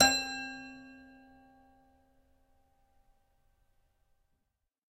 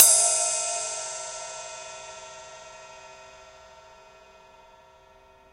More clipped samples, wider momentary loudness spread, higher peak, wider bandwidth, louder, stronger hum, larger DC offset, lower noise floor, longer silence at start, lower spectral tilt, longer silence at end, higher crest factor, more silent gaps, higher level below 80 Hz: neither; about the same, 26 LU vs 26 LU; second, -10 dBFS vs 0 dBFS; about the same, 15.5 kHz vs 16 kHz; second, -32 LUFS vs -23 LUFS; neither; neither; first, -83 dBFS vs -55 dBFS; about the same, 0 s vs 0 s; first, -0.5 dB/octave vs 2.5 dB/octave; first, 4 s vs 2.15 s; about the same, 28 dB vs 28 dB; neither; about the same, -64 dBFS vs -66 dBFS